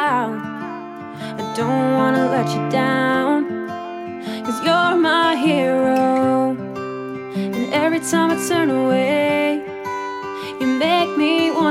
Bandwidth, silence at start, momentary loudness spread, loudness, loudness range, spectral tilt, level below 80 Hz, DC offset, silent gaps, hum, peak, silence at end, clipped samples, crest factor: 15.5 kHz; 0 s; 12 LU; -19 LUFS; 2 LU; -5 dB/octave; -66 dBFS; under 0.1%; none; none; -4 dBFS; 0 s; under 0.1%; 14 dB